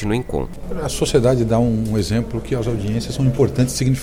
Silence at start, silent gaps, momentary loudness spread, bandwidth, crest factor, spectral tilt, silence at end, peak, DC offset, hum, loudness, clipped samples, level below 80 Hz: 0 s; none; 9 LU; 16 kHz; 16 dB; -6 dB/octave; 0 s; -2 dBFS; under 0.1%; none; -19 LUFS; under 0.1%; -32 dBFS